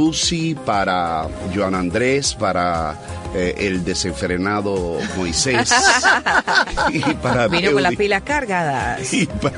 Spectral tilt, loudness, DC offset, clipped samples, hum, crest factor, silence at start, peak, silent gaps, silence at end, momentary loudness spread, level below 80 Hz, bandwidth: -3.5 dB/octave; -18 LUFS; under 0.1%; under 0.1%; none; 16 dB; 0 s; -2 dBFS; none; 0 s; 8 LU; -38 dBFS; 11 kHz